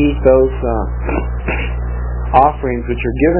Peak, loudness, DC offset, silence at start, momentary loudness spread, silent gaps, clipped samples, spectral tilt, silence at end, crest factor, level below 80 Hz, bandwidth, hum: 0 dBFS; -16 LUFS; 0.1%; 0 s; 10 LU; none; under 0.1%; -11.5 dB/octave; 0 s; 14 dB; -20 dBFS; 4 kHz; 60 Hz at -20 dBFS